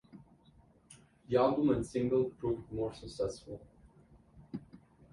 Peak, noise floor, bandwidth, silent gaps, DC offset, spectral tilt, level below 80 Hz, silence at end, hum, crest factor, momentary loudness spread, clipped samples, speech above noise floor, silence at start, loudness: -16 dBFS; -64 dBFS; 11.5 kHz; none; under 0.1%; -7 dB/octave; -60 dBFS; 0.35 s; none; 20 dB; 18 LU; under 0.1%; 31 dB; 0.15 s; -33 LUFS